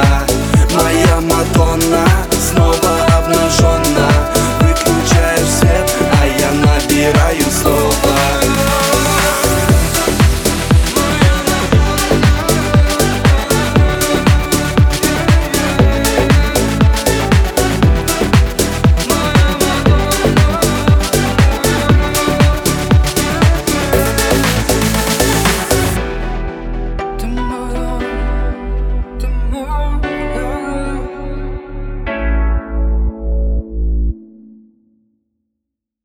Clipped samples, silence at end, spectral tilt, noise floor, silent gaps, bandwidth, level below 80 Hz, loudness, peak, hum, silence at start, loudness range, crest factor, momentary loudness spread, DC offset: under 0.1%; 1.8 s; -5 dB/octave; -77 dBFS; none; over 20 kHz; -18 dBFS; -13 LUFS; 0 dBFS; none; 0 s; 9 LU; 12 dB; 9 LU; under 0.1%